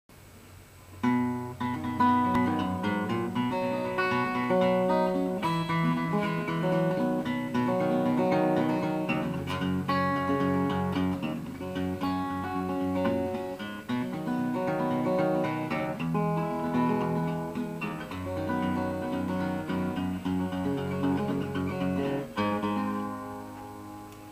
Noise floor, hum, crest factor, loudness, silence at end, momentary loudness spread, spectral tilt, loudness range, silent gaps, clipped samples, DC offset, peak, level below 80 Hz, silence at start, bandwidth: -50 dBFS; none; 16 dB; -29 LUFS; 0 s; 8 LU; -7.5 dB/octave; 4 LU; none; under 0.1%; under 0.1%; -12 dBFS; -58 dBFS; 0.1 s; 15.5 kHz